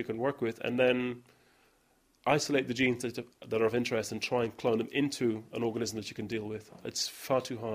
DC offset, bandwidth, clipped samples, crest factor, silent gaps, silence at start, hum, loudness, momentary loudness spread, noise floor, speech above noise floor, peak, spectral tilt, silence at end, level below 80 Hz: under 0.1%; 15.5 kHz; under 0.1%; 22 dB; none; 0 s; none; -32 LUFS; 10 LU; -69 dBFS; 37 dB; -10 dBFS; -4.5 dB/octave; 0 s; -68 dBFS